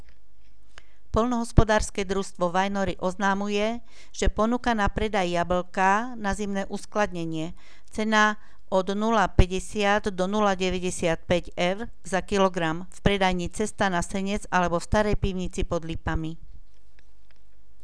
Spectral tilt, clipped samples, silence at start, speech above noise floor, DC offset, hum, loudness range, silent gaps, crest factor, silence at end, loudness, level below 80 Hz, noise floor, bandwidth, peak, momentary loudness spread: -5 dB/octave; under 0.1%; 1.15 s; 34 dB; 2%; none; 3 LU; none; 26 dB; 1.2 s; -26 LUFS; -34 dBFS; -59 dBFS; 11 kHz; 0 dBFS; 8 LU